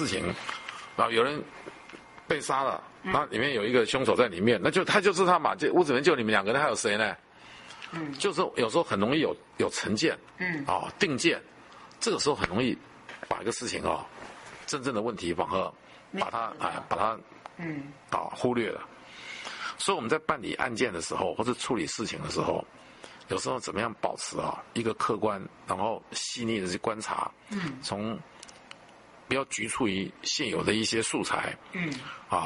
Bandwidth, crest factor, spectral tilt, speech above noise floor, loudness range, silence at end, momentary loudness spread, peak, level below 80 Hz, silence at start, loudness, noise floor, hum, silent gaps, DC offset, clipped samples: 11.5 kHz; 24 dB; -4 dB/octave; 24 dB; 8 LU; 0 s; 16 LU; -6 dBFS; -62 dBFS; 0 s; -29 LUFS; -53 dBFS; none; none; under 0.1%; under 0.1%